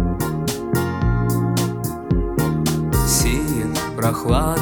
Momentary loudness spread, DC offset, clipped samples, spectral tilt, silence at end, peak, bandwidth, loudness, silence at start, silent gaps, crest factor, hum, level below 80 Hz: 5 LU; 0.1%; under 0.1%; -5.5 dB/octave; 0 s; -4 dBFS; over 20 kHz; -20 LUFS; 0 s; none; 16 dB; none; -28 dBFS